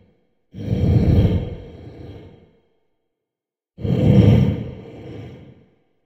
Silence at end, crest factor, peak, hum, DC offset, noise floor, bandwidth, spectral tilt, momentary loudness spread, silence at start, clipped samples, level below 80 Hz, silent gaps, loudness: 0.7 s; 20 dB; 0 dBFS; none; under 0.1%; -87 dBFS; 6 kHz; -10 dB/octave; 25 LU; 0.55 s; under 0.1%; -32 dBFS; none; -17 LUFS